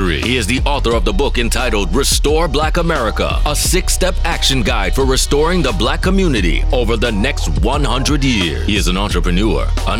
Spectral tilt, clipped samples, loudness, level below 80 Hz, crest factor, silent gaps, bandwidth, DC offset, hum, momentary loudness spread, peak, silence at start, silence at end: -4 dB/octave; under 0.1%; -15 LUFS; -18 dBFS; 14 dB; none; 16.5 kHz; under 0.1%; none; 3 LU; 0 dBFS; 0 s; 0 s